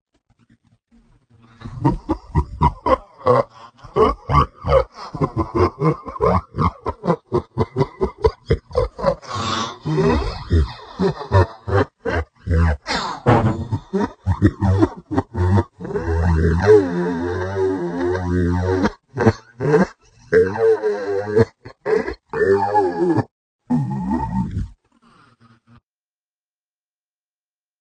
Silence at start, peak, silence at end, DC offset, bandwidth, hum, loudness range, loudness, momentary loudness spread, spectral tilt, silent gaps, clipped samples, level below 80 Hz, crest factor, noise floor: 1.6 s; 0 dBFS; 3.1 s; under 0.1%; 9.2 kHz; 50 Hz at -45 dBFS; 4 LU; -20 LUFS; 7 LU; -7.5 dB/octave; 23.31-23.59 s; under 0.1%; -34 dBFS; 20 dB; under -90 dBFS